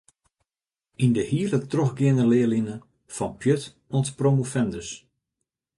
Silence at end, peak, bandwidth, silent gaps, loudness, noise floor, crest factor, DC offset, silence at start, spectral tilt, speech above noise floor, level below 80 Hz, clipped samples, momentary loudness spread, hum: 0.8 s; -8 dBFS; 11.5 kHz; none; -24 LUFS; under -90 dBFS; 16 dB; under 0.1%; 1 s; -7 dB/octave; over 67 dB; -58 dBFS; under 0.1%; 14 LU; none